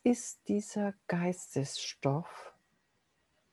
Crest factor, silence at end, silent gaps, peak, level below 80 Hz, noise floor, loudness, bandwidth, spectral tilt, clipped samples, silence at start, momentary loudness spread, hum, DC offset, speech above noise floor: 20 dB; 1.05 s; none; -14 dBFS; -78 dBFS; -76 dBFS; -35 LUFS; 12.5 kHz; -5.5 dB/octave; under 0.1%; 0.05 s; 11 LU; none; under 0.1%; 42 dB